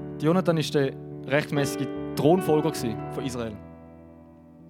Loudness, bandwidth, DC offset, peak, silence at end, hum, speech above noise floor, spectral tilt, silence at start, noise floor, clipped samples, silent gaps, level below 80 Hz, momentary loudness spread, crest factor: -26 LUFS; 17.5 kHz; under 0.1%; -6 dBFS; 0 s; none; 25 dB; -6 dB/octave; 0 s; -49 dBFS; under 0.1%; none; -58 dBFS; 13 LU; 20 dB